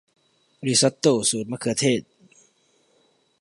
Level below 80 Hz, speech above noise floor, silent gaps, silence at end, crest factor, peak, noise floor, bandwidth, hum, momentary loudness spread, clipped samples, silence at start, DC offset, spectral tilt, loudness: -66 dBFS; 42 dB; none; 1.4 s; 20 dB; -4 dBFS; -64 dBFS; 11.5 kHz; none; 8 LU; under 0.1%; 0.6 s; under 0.1%; -3.5 dB/octave; -22 LUFS